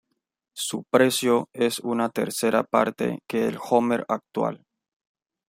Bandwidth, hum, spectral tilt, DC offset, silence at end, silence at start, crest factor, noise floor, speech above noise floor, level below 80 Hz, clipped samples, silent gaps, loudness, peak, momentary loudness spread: 16 kHz; none; -4 dB/octave; under 0.1%; 0.9 s; 0.55 s; 20 dB; -79 dBFS; 55 dB; -70 dBFS; under 0.1%; none; -24 LUFS; -4 dBFS; 9 LU